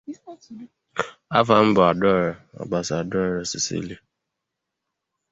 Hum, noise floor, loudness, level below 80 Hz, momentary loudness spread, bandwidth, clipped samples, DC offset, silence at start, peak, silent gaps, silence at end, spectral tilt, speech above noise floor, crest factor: none; -82 dBFS; -21 LUFS; -54 dBFS; 23 LU; 8 kHz; under 0.1%; under 0.1%; 0.1 s; -2 dBFS; none; 1.35 s; -5 dB/octave; 60 dB; 22 dB